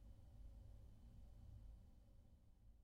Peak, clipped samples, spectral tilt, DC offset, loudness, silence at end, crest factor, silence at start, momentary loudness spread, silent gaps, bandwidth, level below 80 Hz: -52 dBFS; under 0.1%; -7.5 dB/octave; under 0.1%; -65 LUFS; 0 s; 10 dB; 0 s; 3 LU; none; 9.6 kHz; -64 dBFS